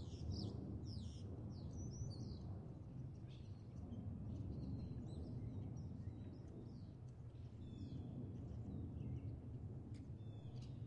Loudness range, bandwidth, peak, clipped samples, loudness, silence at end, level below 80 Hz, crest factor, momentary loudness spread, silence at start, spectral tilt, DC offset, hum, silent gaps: 2 LU; 9.6 kHz; -36 dBFS; under 0.1%; -52 LUFS; 0 s; -60 dBFS; 14 dB; 6 LU; 0 s; -7.5 dB/octave; under 0.1%; none; none